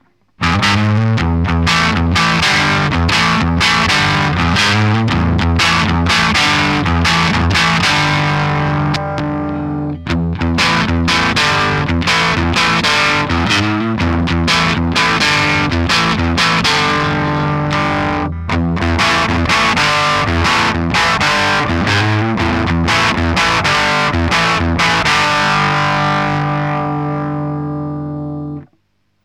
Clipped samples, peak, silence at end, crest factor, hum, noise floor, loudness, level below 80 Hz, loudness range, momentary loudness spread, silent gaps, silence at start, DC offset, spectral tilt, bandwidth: under 0.1%; 0 dBFS; 0.6 s; 12 dB; none; -62 dBFS; -13 LUFS; -28 dBFS; 3 LU; 7 LU; none; 0.4 s; under 0.1%; -4.5 dB/octave; 15 kHz